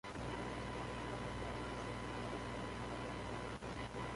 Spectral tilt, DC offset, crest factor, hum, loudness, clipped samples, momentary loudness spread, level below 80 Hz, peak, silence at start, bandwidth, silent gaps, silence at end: -5.5 dB/octave; under 0.1%; 12 dB; 60 Hz at -50 dBFS; -45 LUFS; under 0.1%; 1 LU; -54 dBFS; -32 dBFS; 0.05 s; 11.5 kHz; none; 0 s